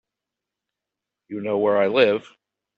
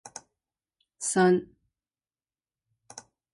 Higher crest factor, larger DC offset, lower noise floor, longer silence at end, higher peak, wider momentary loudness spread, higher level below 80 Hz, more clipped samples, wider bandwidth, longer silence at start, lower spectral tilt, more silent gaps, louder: about the same, 20 dB vs 20 dB; neither; second, -86 dBFS vs under -90 dBFS; first, 0.55 s vs 0.35 s; first, -4 dBFS vs -12 dBFS; second, 13 LU vs 25 LU; about the same, -72 dBFS vs -72 dBFS; neither; second, 6.6 kHz vs 11.5 kHz; first, 1.3 s vs 0.05 s; first, -6.5 dB/octave vs -5 dB/octave; neither; first, -20 LUFS vs -25 LUFS